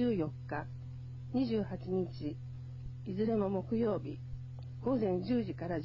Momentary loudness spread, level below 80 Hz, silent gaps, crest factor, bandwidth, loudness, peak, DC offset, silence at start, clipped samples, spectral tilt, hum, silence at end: 13 LU; -56 dBFS; none; 16 dB; 7.2 kHz; -37 LUFS; -20 dBFS; under 0.1%; 0 s; under 0.1%; -10 dB/octave; none; 0 s